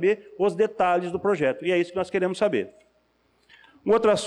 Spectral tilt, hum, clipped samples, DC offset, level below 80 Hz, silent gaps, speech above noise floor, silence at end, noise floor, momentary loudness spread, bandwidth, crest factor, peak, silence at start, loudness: -5.5 dB/octave; none; under 0.1%; under 0.1%; -62 dBFS; none; 43 dB; 0 s; -66 dBFS; 5 LU; 10.5 kHz; 12 dB; -12 dBFS; 0 s; -24 LUFS